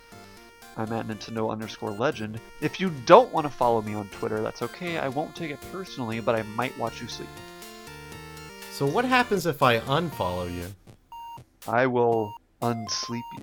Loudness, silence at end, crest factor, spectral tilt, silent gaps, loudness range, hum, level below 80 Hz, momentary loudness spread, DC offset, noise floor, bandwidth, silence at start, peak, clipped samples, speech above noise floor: -26 LUFS; 0 s; 26 dB; -5 dB/octave; none; 7 LU; none; -56 dBFS; 19 LU; under 0.1%; -48 dBFS; over 20 kHz; 0.1 s; 0 dBFS; under 0.1%; 23 dB